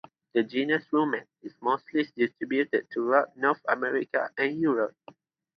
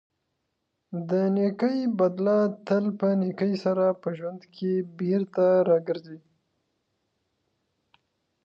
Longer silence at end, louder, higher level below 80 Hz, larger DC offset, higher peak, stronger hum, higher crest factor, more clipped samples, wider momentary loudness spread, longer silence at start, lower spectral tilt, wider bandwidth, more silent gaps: second, 0.65 s vs 2.25 s; second, -28 LUFS vs -25 LUFS; about the same, -80 dBFS vs -78 dBFS; neither; first, -6 dBFS vs -12 dBFS; neither; first, 22 dB vs 16 dB; neither; second, 5 LU vs 11 LU; second, 0.35 s vs 0.9 s; second, -7.5 dB/octave vs -9 dB/octave; second, 6.2 kHz vs 7 kHz; neither